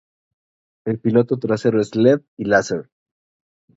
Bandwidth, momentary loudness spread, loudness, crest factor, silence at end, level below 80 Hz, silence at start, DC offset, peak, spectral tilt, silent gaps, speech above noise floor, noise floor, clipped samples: 8 kHz; 10 LU; -19 LUFS; 20 dB; 0.95 s; -58 dBFS; 0.85 s; under 0.1%; 0 dBFS; -6.5 dB/octave; 2.28-2.37 s; over 72 dB; under -90 dBFS; under 0.1%